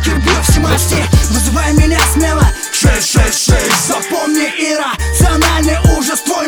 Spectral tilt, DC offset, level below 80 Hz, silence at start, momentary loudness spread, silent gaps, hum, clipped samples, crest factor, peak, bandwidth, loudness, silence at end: -4 dB/octave; under 0.1%; -16 dBFS; 0 s; 4 LU; none; none; under 0.1%; 12 dB; 0 dBFS; over 20 kHz; -11 LUFS; 0 s